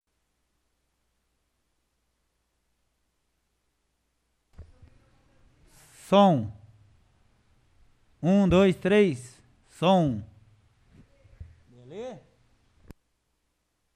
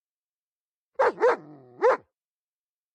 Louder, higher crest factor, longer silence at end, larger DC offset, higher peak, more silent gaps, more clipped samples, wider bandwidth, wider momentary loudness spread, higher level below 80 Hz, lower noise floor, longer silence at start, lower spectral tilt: about the same, -23 LUFS vs -25 LUFS; first, 22 dB vs 16 dB; first, 1.8 s vs 0.95 s; neither; first, -8 dBFS vs -12 dBFS; neither; neither; first, 11 kHz vs 9.6 kHz; first, 20 LU vs 9 LU; first, -54 dBFS vs -76 dBFS; second, -76 dBFS vs under -90 dBFS; first, 4.6 s vs 1 s; first, -7 dB/octave vs -4.5 dB/octave